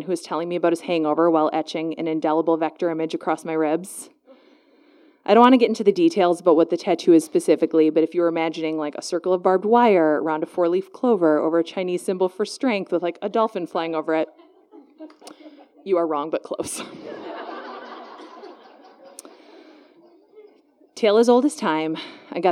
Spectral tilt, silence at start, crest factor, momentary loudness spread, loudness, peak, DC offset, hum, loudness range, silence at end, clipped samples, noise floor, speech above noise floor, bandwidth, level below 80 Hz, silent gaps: -5.5 dB/octave; 0 s; 22 dB; 17 LU; -21 LUFS; 0 dBFS; under 0.1%; none; 10 LU; 0 s; under 0.1%; -56 dBFS; 36 dB; 13 kHz; -76 dBFS; none